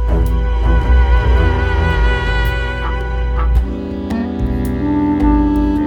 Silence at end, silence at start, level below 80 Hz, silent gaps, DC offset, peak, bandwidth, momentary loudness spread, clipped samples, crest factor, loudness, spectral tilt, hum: 0 s; 0 s; -16 dBFS; none; under 0.1%; -2 dBFS; 5.8 kHz; 7 LU; under 0.1%; 12 dB; -16 LUFS; -8 dB/octave; none